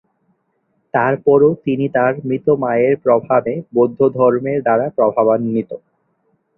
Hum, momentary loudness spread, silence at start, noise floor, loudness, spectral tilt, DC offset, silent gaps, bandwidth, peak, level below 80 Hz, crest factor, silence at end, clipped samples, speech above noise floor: none; 7 LU; 0.95 s; -66 dBFS; -16 LUFS; -11.5 dB/octave; under 0.1%; none; 3.3 kHz; -2 dBFS; -58 dBFS; 14 dB; 0.8 s; under 0.1%; 51 dB